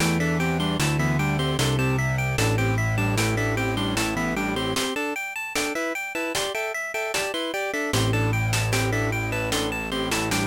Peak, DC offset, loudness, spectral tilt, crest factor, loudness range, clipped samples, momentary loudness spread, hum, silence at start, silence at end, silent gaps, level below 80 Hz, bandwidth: -10 dBFS; under 0.1%; -24 LUFS; -4.5 dB/octave; 14 dB; 3 LU; under 0.1%; 4 LU; none; 0 s; 0 s; none; -40 dBFS; 17 kHz